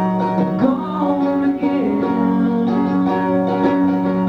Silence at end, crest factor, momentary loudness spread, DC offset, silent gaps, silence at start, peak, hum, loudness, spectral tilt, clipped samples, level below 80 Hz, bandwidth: 0 s; 12 dB; 2 LU; under 0.1%; none; 0 s; -4 dBFS; none; -17 LUFS; -9.5 dB/octave; under 0.1%; -50 dBFS; 5.8 kHz